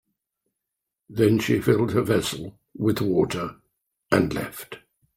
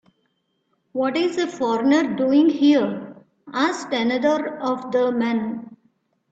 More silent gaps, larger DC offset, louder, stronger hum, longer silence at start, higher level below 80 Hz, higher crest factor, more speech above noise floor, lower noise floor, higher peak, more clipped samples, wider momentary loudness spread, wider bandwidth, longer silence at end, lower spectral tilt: neither; neither; about the same, -23 LUFS vs -21 LUFS; neither; first, 1.1 s vs 0.95 s; first, -54 dBFS vs -68 dBFS; first, 20 dB vs 14 dB; first, 62 dB vs 50 dB; first, -84 dBFS vs -70 dBFS; about the same, -4 dBFS vs -6 dBFS; neither; first, 16 LU vs 13 LU; first, 16 kHz vs 8 kHz; second, 0.4 s vs 0.6 s; about the same, -6 dB/octave vs -5 dB/octave